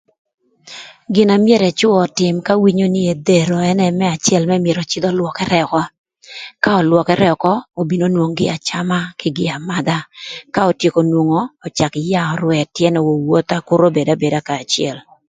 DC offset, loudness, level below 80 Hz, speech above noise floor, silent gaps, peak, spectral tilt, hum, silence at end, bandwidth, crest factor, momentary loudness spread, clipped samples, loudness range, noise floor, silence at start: under 0.1%; -15 LUFS; -54 dBFS; 22 dB; 5.98-6.04 s; 0 dBFS; -5.5 dB/octave; none; 0.3 s; 9.4 kHz; 16 dB; 9 LU; under 0.1%; 4 LU; -37 dBFS; 0.65 s